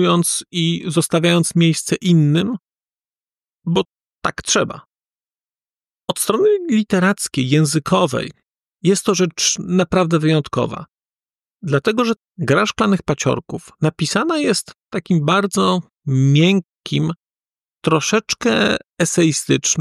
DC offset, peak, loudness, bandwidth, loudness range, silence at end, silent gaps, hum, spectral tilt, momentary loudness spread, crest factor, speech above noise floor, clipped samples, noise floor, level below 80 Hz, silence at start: under 0.1%; -4 dBFS; -17 LUFS; 14 kHz; 3 LU; 0 s; 4.01-4.05 s, 5.17-5.21 s; none; -4.5 dB/octave; 10 LU; 14 dB; over 73 dB; under 0.1%; under -90 dBFS; -52 dBFS; 0 s